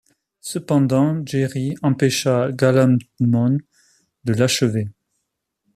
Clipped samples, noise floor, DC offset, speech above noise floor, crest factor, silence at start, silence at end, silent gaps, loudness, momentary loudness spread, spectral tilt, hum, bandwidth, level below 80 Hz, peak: under 0.1%; -76 dBFS; under 0.1%; 58 dB; 16 dB; 0.45 s; 0.85 s; none; -19 LUFS; 11 LU; -6 dB/octave; none; 14 kHz; -58 dBFS; -4 dBFS